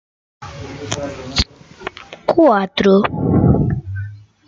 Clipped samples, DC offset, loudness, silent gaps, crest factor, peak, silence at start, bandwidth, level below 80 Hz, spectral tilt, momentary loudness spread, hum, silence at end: under 0.1%; under 0.1%; -16 LUFS; none; 16 dB; 0 dBFS; 0.4 s; 8.8 kHz; -34 dBFS; -6.5 dB/octave; 18 LU; none; 0.3 s